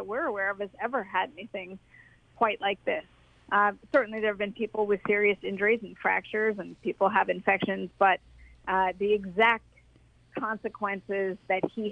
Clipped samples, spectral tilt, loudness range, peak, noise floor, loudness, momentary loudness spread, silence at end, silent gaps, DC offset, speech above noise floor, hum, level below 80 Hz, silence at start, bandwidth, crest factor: under 0.1%; -7 dB/octave; 4 LU; -10 dBFS; -60 dBFS; -28 LUFS; 10 LU; 0 s; none; under 0.1%; 32 dB; none; -62 dBFS; 0 s; 5.6 kHz; 20 dB